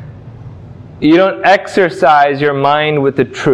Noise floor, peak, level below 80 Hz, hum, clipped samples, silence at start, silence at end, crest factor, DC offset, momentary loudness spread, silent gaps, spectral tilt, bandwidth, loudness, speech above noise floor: -32 dBFS; 0 dBFS; -46 dBFS; none; under 0.1%; 0 s; 0 s; 12 dB; under 0.1%; 5 LU; none; -6 dB/octave; 10.5 kHz; -11 LUFS; 21 dB